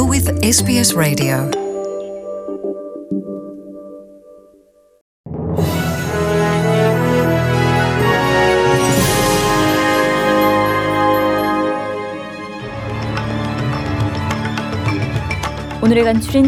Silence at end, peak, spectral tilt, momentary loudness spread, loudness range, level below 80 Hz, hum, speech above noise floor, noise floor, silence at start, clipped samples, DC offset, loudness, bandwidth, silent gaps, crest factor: 0 s; -2 dBFS; -5 dB/octave; 13 LU; 12 LU; -38 dBFS; none; 37 dB; -51 dBFS; 0 s; under 0.1%; under 0.1%; -16 LUFS; 17.5 kHz; 5.01-5.24 s; 14 dB